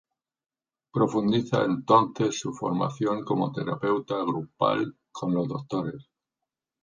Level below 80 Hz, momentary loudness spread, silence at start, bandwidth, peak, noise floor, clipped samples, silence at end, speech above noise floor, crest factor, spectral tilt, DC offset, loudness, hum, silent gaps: -66 dBFS; 10 LU; 0.95 s; 10 kHz; -6 dBFS; -87 dBFS; under 0.1%; 0.8 s; 61 dB; 20 dB; -6.5 dB/octave; under 0.1%; -27 LUFS; none; none